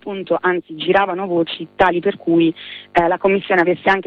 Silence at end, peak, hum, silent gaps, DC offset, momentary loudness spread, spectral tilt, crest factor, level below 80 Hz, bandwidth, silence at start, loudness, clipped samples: 0.05 s; -2 dBFS; none; none; under 0.1%; 5 LU; -7.5 dB/octave; 16 dB; -48 dBFS; 6 kHz; 0.05 s; -17 LUFS; under 0.1%